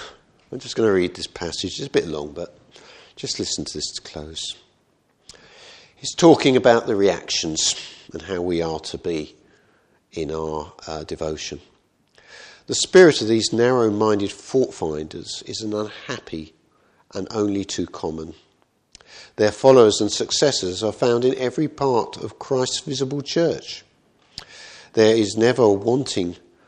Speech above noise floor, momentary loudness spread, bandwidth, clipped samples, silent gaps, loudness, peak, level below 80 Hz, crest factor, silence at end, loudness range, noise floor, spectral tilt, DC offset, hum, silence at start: 43 dB; 20 LU; 10.5 kHz; under 0.1%; none; -20 LUFS; 0 dBFS; -54 dBFS; 22 dB; 0.3 s; 11 LU; -63 dBFS; -4 dB/octave; under 0.1%; none; 0 s